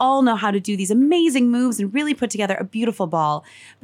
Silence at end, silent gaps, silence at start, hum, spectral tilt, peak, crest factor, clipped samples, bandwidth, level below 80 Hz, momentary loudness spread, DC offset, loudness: 0.45 s; none; 0 s; none; -5 dB/octave; -6 dBFS; 12 dB; under 0.1%; 14.5 kHz; -70 dBFS; 7 LU; under 0.1%; -20 LUFS